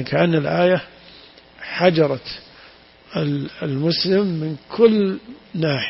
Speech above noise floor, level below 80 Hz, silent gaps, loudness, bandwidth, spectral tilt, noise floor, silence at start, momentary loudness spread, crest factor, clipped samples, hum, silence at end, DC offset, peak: 28 dB; -56 dBFS; none; -19 LUFS; 5.8 kHz; -10 dB/octave; -47 dBFS; 0 s; 16 LU; 18 dB; under 0.1%; none; 0 s; under 0.1%; -2 dBFS